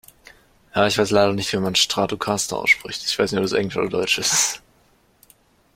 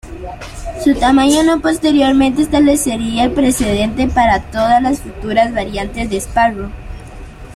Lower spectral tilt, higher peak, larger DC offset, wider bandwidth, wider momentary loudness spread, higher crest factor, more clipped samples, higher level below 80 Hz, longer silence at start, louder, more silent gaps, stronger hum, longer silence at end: second, -2.5 dB/octave vs -4.5 dB/octave; about the same, -2 dBFS vs -2 dBFS; neither; first, 16.5 kHz vs 14 kHz; second, 5 LU vs 17 LU; first, 20 dB vs 12 dB; neither; second, -54 dBFS vs -30 dBFS; first, 0.75 s vs 0.05 s; second, -20 LUFS vs -14 LUFS; neither; neither; first, 1.15 s vs 0 s